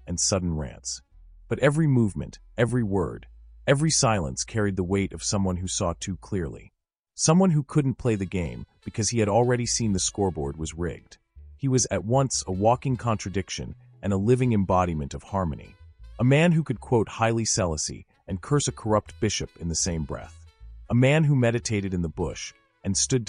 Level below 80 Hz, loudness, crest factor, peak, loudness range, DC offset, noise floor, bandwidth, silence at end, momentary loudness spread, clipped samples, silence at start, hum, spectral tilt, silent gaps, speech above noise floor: -44 dBFS; -25 LUFS; 18 dB; -8 dBFS; 2 LU; under 0.1%; -46 dBFS; 11 kHz; 0 s; 13 LU; under 0.1%; 0.05 s; none; -5 dB/octave; 6.99-7.03 s; 21 dB